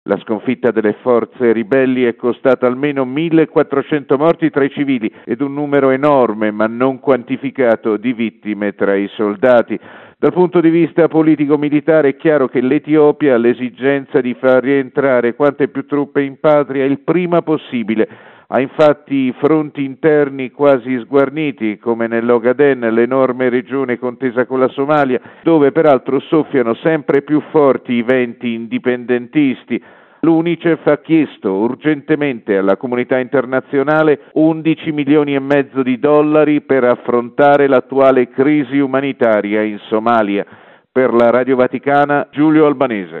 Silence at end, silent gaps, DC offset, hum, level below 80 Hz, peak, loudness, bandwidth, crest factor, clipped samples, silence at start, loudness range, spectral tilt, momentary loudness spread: 0 s; none; under 0.1%; none; -62 dBFS; 0 dBFS; -14 LUFS; 4.2 kHz; 14 dB; under 0.1%; 0.05 s; 3 LU; -9.5 dB/octave; 7 LU